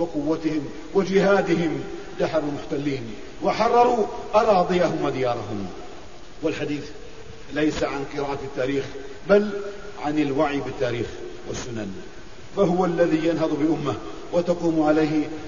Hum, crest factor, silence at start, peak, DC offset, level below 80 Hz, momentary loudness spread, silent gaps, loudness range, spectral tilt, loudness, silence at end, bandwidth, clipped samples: none; 18 dB; 0 s; -4 dBFS; 1%; -48 dBFS; 16 LU; none; 6 LU; -6.5 dB/octave; -23 LUFS; 0 s; 7.4 kHz; under 0.1%